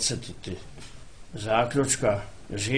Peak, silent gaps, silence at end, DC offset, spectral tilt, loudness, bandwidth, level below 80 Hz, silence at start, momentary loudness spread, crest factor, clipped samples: -10 dBFS; none; 0 s; 0.6%; -3.5 dB/octave; -27 LUFS; 10.5 kHz; -48 dBFS; 0 s; 21 LU; 18 dB; under 0.1%